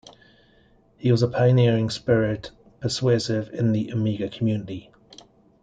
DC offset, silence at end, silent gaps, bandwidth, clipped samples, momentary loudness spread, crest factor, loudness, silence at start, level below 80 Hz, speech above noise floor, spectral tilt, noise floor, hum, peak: under 0.1%; 0.8 s; none; 9 kHz; under 0.1%; 13 LU; 18 dB; -23 LUFS; 1 s; -56 dBFS; 36 dB; -7 dB/octave; -58 dBFS; none; -6 dBFS